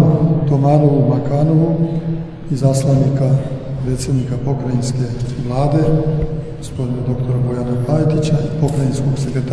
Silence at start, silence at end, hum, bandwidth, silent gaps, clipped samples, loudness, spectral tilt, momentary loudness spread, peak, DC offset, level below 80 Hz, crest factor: 0 s; 0 s; none; 11 kHz; none; under 0.1%; -17 LUFS; -8 dB/octave; 9 LU; 0 dBFS; under 0.1%; -32 dBFS; 14 dB